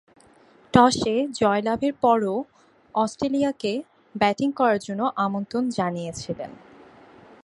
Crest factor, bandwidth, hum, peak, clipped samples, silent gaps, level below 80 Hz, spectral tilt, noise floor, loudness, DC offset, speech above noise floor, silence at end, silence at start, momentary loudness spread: 24 dB; 11.5 kHz; none; 0 dBFS; under 0.1%; none; -56 dBFS; -5.5 dB/octave; -55 dBFS; -23 LUFS; under 0.1%; 32 dB; 0.9 s; 0.75 s; 13 LU